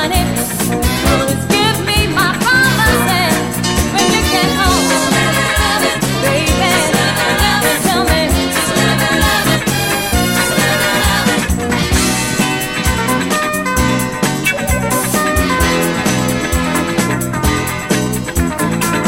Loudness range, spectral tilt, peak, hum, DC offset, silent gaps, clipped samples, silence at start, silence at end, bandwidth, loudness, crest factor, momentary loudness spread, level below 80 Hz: 2 LU; -3.5 dB/octave; 0 dBFS; none; under 0.1%; none; under 0.1%; 0 s; 0 s; 16.5 kHz; -13 LUFS; 14 dB; 4 LU; -24 dBFS